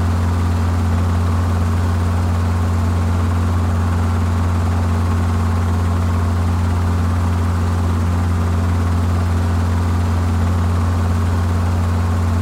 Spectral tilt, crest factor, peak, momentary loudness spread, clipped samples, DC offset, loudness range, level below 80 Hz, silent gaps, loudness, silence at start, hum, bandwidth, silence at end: -7.5 dB/octave; 8 dB; -8 dBFS; 0 LU; under 0.1%; under 0.1%; 0 LU; -26 dBFS; none; -18 LUFS; 0 s; none; 11.5 kHz; 0 s